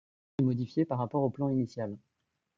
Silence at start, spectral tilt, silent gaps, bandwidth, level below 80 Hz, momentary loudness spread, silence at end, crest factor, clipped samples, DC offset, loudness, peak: 0.4 s; -9.5 dB/octave; none; 7.4 kHz; -66 dBFS; 10 LU; 0.6 s; 16 dB; under 0.1%; under 0.1%; -32 LUFS; -16 dBFS